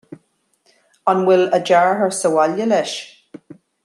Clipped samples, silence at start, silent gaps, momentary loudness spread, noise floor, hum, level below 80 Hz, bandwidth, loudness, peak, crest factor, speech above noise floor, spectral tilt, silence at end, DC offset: under 0.1%; 0.1 s; none; 11 LU; -64 dBFS; none; -70 dBFS; 12.5 kHz; -16 LUFS; -2 dBFS; 16 dB; 48 dB; -4.5 dB/octave; 0.3 s; under 0.1%